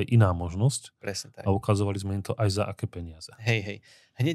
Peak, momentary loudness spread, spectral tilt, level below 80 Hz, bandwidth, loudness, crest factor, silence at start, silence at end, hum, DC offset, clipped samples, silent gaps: -10 dBFS; 12 LU; -6 dB/octave; -52 dBFS; 12.5 kHz; -28 LUFS; 18 dB; 0 s; 0 s; none; under 0.1%; under 0.1%; none